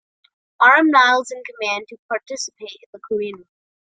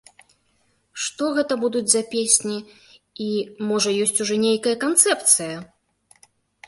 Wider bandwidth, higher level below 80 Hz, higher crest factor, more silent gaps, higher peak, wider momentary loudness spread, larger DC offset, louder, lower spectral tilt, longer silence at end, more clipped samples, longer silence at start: second, 9.4 kHz vs 12 kHz; about the same, -72 dBFS vs -68 dBFS; second, 18 dB vs 24 dB; first, 1.99-2.09 s, 2.86-2.93 s vs none; about the same, -2 dBFS vs 0 dBFS; first, 18 LU vs 14 LU; neither; first, -17 LUFS vs -20 LUFS; about the same, -2 dB/octave vs -2 dB/octave; second, 0.55 s vs 1 s; neither; second, 0.6 s vs 0.95 s